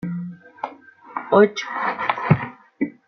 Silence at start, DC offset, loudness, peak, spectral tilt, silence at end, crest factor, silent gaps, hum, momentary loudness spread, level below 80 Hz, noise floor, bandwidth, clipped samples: 0 s; under 0.1%; -21 LUFS; 0 dBFS; -7 dB/octave; 0.15 s; 22 dB; none; none; 18 LU; -58 dBFS; -43 dBFS; 6.4 kHz; under 0.1%